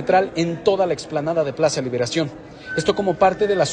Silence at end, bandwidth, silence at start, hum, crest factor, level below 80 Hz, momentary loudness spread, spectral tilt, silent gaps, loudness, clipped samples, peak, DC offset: 0 s; 9.8 kHz; 0 s; none; 18 dB; -52 dBFS; 6 LU; -5 dB/octave; none; -20 LUFS; under 0.1%; -2 dBFS; under 0.1%